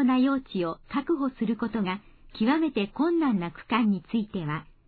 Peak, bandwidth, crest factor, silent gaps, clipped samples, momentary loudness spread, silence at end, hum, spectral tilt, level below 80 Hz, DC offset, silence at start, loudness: -12 dBFS; 4.7 kHz; 16 dB; none; under 0.1%; 8 LU; 0.25 s; none; -10 dB/octave; -56 dBFS; under 0.1%; 0 s; -27 LUFS